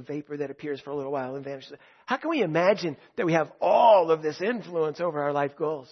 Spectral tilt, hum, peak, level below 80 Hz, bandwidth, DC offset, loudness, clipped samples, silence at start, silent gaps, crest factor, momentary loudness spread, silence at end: -6.5 dB/octave; none; -8 dBFS; -78 dBFS; 6.4 kHz; under 0.1%; -26 LUFS; under 0.1%; 0 s; none; 18 dB; 15 LU; 0.1 s